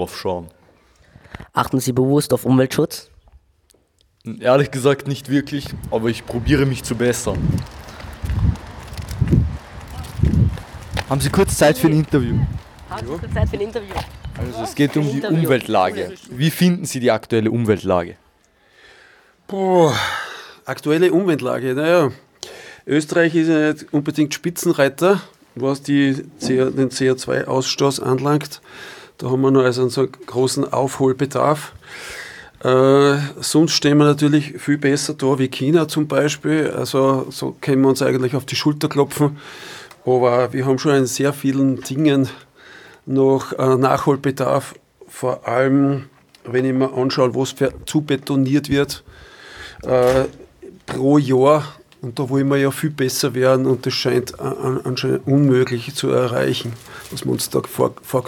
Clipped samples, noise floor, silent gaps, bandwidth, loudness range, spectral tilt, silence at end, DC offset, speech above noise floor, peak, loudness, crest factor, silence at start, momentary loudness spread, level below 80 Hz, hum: under 0.1%; -60 dBFS; none; 19 kHz; 4 LU; -6 dB/octave; 0 s; under 0.1%; 42 dB; -2 dBFS; -18 LUFS; 18 dB; 0 s; 16 LU; -38 dBFS; none